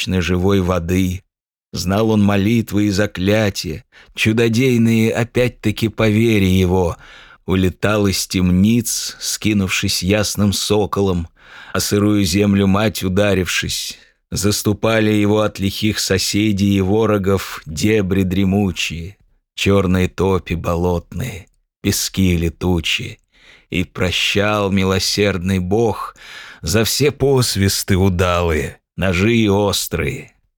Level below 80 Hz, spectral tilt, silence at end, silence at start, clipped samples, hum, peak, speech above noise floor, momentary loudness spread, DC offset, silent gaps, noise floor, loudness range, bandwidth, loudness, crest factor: -42 dBFS; -5 dB/octave; 0.3 s; 0 s; under 0.1%; none; -2 dBFS; 33 dB; 10 LU; under 0.1%; 1.50-1.55 s; -49 dBFS; 2 LU; 19 kHz; -17 LUFS; 16 dB